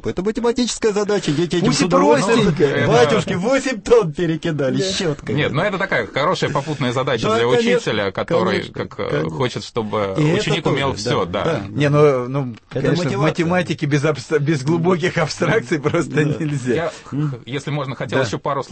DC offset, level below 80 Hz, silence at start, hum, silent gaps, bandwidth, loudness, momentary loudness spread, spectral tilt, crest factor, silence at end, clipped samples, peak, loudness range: under 0.1%; -46 dBFS; 0 s; none; none; 8.8 kHz; -18 LUFS; 8 LU; -5.5 dB/octave; 16 dB; 0 s; under 0.1%; -2 dBFS; 4 LU